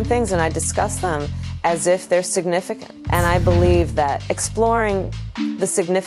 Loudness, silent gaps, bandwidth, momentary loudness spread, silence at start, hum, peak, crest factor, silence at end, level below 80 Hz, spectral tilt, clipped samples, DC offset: -20 LUFS; none; 15.5 kHz; 9 LU; 0 s; none; -4 dBFS; 16 dB; 0 s; -32 dBFS; -5 dB/octave; under 0.1%; under 0.1%